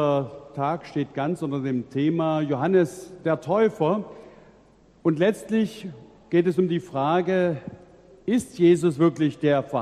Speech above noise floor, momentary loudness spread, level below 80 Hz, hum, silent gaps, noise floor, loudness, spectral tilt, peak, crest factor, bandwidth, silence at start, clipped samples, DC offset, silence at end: 32 dB; 9 LU; -62 dBFS; none; none; -55 dBFS; -24 LUFS; -7.5 dB/octave; -8 dBFS; 16 dB; 12.5 kHz; 0 s; under 0.1%; under 0.1%; 0 s